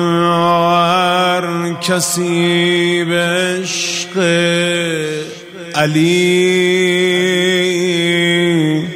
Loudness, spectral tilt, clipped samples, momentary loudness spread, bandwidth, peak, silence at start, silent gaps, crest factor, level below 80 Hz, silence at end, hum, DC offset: -13 LUFS; -4 dB/octave; under 0.1%; 6 LU; 16 kHz; 0 dBFS; 0 s; none; 14 dB; -60 dBFS; 0 s; none; under 0.1%